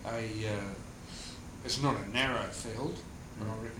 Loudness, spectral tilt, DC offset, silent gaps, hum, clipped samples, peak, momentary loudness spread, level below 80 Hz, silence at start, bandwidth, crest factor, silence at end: -36 LUFS; -4.5 dB/octave; under 0.1%; none; none; under 0.1%; -16 dBFS; 14 LU; -52 dBFS; 0 s; 16.5 kHz; 20 dB; 0 s